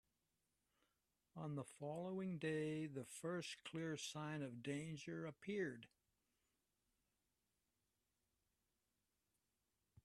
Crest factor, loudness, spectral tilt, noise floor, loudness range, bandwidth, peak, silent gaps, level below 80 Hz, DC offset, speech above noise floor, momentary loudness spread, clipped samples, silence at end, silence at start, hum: 18 dB; -49 LUFS; -5.5 dB/octave; -90 dBFS; 7 LU; 13 kHz; -34 dBFS; none; -86 dBFS; under 0.1%; 42 dB; 6 LU; under 0.1%; 4.2 s; 1.35 s; none